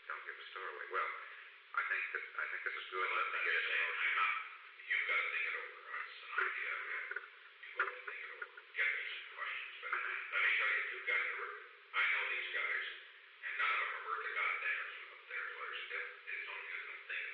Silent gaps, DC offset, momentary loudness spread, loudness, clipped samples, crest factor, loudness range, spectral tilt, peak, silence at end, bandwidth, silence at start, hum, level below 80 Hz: none; under 0.1%; 13 LU; -38 LUFS; under 0.1%; 16 dB; 5 LU; 6.5 dB/octave; -24 dBFS; 0 s; 6.4 kHz; 0 s; none; under -90 dBFS